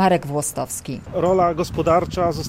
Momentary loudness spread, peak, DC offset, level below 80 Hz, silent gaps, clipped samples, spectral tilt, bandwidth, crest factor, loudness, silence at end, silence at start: 9 LU; -4 dBFS; under 0.1%; -42 dBFS; none; under 0.1%; -5.5 dB/octave; 16 kHz; 14 dB; -21 LUFS; 0 s; 0 s